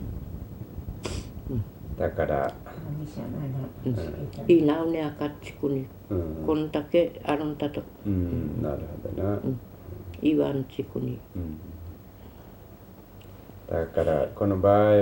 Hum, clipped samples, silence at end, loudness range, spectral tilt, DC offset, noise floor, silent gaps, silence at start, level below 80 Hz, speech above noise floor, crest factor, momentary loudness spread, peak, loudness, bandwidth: none; under 0.1%; 0 s; 6 LU; -8 dB/octave; under 0.1%; -47 dBFS; none; 0 s; -46 dBFS; 21 dB; 20 dB; 21 LU; -8 dBFS; -28 LUFS; 16 kHz